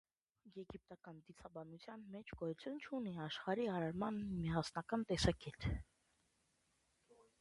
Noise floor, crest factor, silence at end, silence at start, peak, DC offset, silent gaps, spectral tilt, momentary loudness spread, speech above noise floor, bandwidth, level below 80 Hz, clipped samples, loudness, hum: -81 dBFS; 24 dB; 0.25 s; 0.45 s; -22 dBFS; under 0.1%; none; -6 dB/octave; 17 LU; 38 dB; 11.5 kHz; -58 dBFS; under 0.1%; -43 LUFS; none